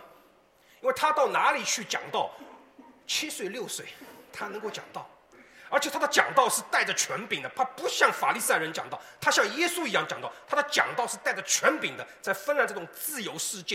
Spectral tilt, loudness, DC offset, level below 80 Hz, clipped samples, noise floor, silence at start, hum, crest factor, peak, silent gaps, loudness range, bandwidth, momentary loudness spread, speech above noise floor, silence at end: -1 dB/octave; -27 LUFS; under 0.1%; -76 dBFS; under 0.1%; -60 dBFS; 0 s; none; 26 dB; -4 dBFS; none; 8 LU; 16.5 kHz; 13 LU; 32 dB; 0 s